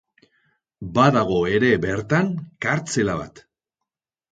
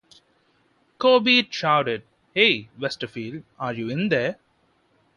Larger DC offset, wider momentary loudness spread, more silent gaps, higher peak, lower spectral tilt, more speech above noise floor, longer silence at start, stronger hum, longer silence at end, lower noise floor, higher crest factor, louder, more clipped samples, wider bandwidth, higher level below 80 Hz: neither; second, 10 LU vs 14 LU; neither; about the same, -2 dBFS vs -4 dBFS; about the same, -6 dB/octave vs -5 dB/octave; first, 64 dB vs 43 dB; second, 0.8 s vs 1 s; neither; about the same, 0.9 s vs 0.85 s; first, -85 dBFS vs -65 dBFS; about the same, 20 dB vs 20 dB; about the same, -21 LUFS vs -22 LUFS; neither; second, 9.4 kHz vs 10.5 kHz; first, -50 dBFS vs -66 dBFS